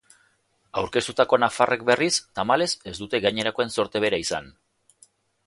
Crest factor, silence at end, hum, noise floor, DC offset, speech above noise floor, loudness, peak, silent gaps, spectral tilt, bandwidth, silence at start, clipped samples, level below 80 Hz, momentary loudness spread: 22 dB; 0.95 s; none; -66 dBFS; under 0.1%; 43 dB; -23 LUFS; -2 dBFS; none; -3 dB/octave; 11.5 kHz; 0.75 s; under 0.1%; -58 dBFS; 9 LU